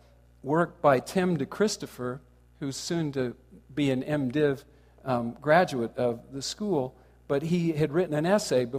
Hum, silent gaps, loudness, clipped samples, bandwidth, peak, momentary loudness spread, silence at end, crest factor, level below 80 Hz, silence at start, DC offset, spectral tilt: none; none; -28 LUFS; under 0.1%; 15.5 kHz; -8 dBFS; 13 LU; 0 s; 20 dB; -60 dBFS; 0.45 s; under 0.1%; -5.5 dB/octave